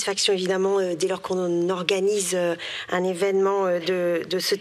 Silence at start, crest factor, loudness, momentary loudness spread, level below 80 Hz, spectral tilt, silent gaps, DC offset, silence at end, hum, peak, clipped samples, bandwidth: 0 s; 18 dB; -23 LUFS; 4 LU; -74 dBFS; -3.5 dB/octave; none; under 0.1%; 0 s; none; -4 dBFS; under 0.1%; 14.5 kHz